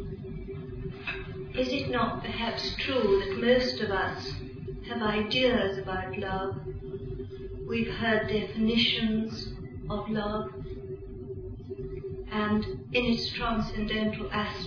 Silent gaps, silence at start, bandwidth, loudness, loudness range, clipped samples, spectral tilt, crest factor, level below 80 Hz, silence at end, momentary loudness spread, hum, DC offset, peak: none; 0 s; 5.4 kHz; -30 LUFS; 5 LU; under 0.1%; -6 dB/octave; 18 dB; -44 dBFS; 0 s; 15 LU; none; under 0.1%; -12 dBFS